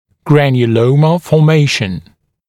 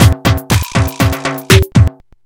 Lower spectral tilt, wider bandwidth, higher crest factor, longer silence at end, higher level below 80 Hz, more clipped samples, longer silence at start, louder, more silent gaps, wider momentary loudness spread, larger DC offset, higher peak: first, -7 dB/octave vs -5 dB/octave; second, 12.5 kHz vs 19 kHz; about the same, 12 dB vs 12 dB; first, 0.5 s vs 0.35 s; second, -48 dBFS vs -24 dBFS; second, under 0.1% vs 0.9%; first, 0.25 s vs 0 s; about the same, -11 LUFS vs -12 LUFS; neither; about the same, 7 LU vs 6 LU; neither; about the same, 0 dBFS vs 0 dBFS